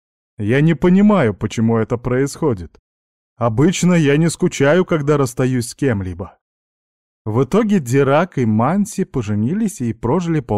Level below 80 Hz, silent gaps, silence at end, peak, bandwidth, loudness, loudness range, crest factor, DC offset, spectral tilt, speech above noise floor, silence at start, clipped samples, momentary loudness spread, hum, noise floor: -44 dBFS; 2.79-3.36 s, 6.41-7.25 s; 0 s; -4 dBFS; 14 kHz; -17 LUFS; 2 LU; 12 dB; 0.4%; -6.5 dB/octave; over 74 dB; 0.4 s; under 0.1%; 8 LU; none; under -90 dBFS